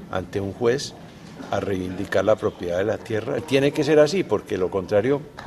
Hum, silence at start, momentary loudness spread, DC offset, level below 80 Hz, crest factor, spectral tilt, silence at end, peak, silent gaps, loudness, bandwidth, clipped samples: none; 0 s; 11 LU; under 0.1%; -56 dBFS; 18 dB; -5.5 dB/octave; 0 s; -4 dBFS; none; -23 LUFS; 13.5 kHz; under 0.1%